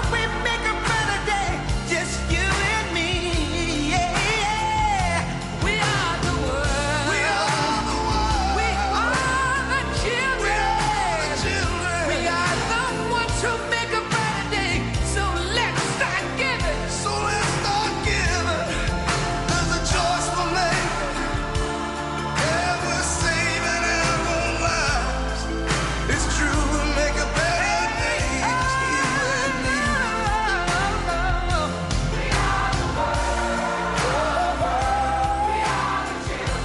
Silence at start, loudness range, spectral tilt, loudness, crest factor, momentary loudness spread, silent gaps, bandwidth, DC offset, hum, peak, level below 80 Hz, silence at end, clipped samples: 0 s; 1 LU; -3.5 dB/octave; -22 LUFS; 16 dB; 3 LU; none; 11.5 kHz; under 0.1%; none; -6 dBFS; -30 dBFS; 0 s; under 0.1%